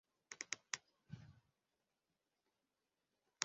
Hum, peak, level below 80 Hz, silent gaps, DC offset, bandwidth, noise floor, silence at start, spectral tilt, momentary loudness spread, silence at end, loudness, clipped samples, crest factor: none; -16 dBFS; -86 dBFS; none; under 0.1%; 7.4 kHz; -90 dBFS; 0.3 s; -0.5 dB/octave; 14 LU; 0 s; -51 LUFS; under 0.1%; 38 dB